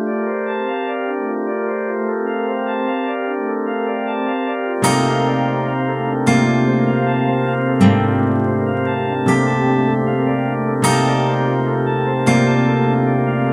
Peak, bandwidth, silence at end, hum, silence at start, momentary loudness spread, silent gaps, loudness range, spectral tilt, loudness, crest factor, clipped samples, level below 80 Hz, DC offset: 0 dBFS; 14.5 kHz; 0 s; none; 0 s; 7 LU; none; 5 LU; -6.5 dB/octave; -18 LUFS; 18 dB; under 0.1%; -54 dBFS; under 0.1%